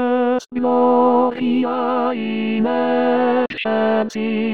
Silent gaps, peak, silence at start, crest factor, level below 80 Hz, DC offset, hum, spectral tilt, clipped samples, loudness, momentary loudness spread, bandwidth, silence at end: none; -6 dBFS; 0 s; 12 dB; -62 dBFS; 0.6%; none; -6.5 dB/octave; under 0.1%; -18 LUFS; 6 LU; 7.2 kHz; 0 s